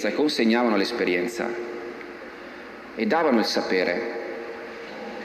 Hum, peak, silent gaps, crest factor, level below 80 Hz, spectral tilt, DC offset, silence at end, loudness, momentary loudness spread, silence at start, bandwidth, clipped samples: none; -8 dBFS; none; 16 dB; -66 dBFS; -4.5 dB/octave; under 0.1%; 0 s; -24 LUFS; 18 LU; 0 s; 14 kHz; under 0.1%